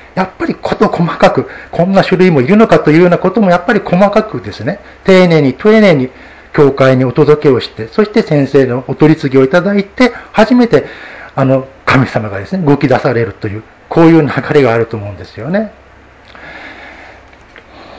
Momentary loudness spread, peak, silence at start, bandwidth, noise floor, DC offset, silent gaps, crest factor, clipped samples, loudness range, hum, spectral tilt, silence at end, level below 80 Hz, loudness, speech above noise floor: 14 LU; 0 dBFS; 0.15 s; 8 kHz; -39 dBFS; under 0.1%; none; 10 dB; 1%; 4 LU; none; -7.5 dB/octave; 0 s; -40 dBFS; -10 LUFS; 29 dB